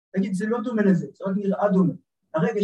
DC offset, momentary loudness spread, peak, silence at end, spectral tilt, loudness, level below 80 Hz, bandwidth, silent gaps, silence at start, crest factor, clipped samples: under 0.1%; 7 LU; -8 dBFS; 0 s; -8.5 dB/octave; -24 LUFS; -72 dBFS; 11 kHz; none; 0.15 s; 14 dB; under 0.1%